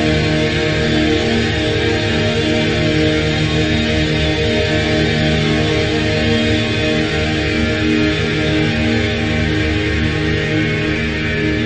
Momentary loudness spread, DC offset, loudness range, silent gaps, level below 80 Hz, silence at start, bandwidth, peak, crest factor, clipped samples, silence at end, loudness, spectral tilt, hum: 2 LU; under 0.1%; 1 LU; none; -28 dBFS; 0 s; 9 kHz; -2 dBFS; 12 dB; under 0.1%; 0 s; -15 LUFS; -5.5 dB/octave; none